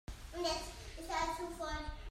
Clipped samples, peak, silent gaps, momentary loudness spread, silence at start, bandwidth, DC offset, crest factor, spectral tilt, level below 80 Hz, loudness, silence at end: under 0.1%; -24 dBFS; none; 10 LU; 0.1 s; 16 kHz; under 0.1%; 18 dB; -3.5 dB/octave; -50 dBFS; -41 LUFS; 0 s